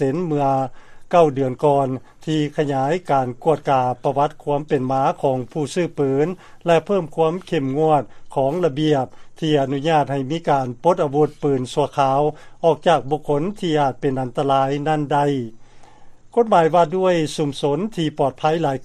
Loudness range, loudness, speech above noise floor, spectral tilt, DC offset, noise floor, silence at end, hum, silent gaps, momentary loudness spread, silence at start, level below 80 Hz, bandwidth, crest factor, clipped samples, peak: 1 LU; -20 LUFS; 22 dB; -6.5 dB/octave; under 0.1%; -41 dBFS; 0 s; none; none; 6 LU; 0 s; -50 dBFS; 12 kHz; 18 dB; under 0.1%; -2 dBFS